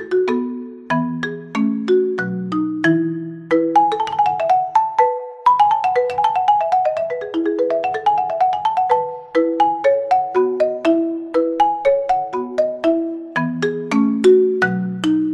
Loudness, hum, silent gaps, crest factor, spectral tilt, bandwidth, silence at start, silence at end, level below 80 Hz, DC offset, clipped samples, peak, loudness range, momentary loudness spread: -18 LUFS; none; none; 16 dB; -6.5 dB/octave; 10.5 kHz; 0 s; 0 s; -60 dBFS; under 0.1%; under 0.1%; -2 dBFS; 2 LU; 8 LU